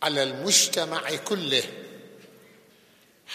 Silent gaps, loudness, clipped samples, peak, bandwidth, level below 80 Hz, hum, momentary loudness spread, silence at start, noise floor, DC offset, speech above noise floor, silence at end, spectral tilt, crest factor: none; -23 LUFS; under 0.1%; -6 dBFS; 15 kHz; -82 dBFS; none; 18 LU; 0 s; -58 dBFS; under 0.1%; 33 dB; 0 s; -1 dB/octave; 22 dB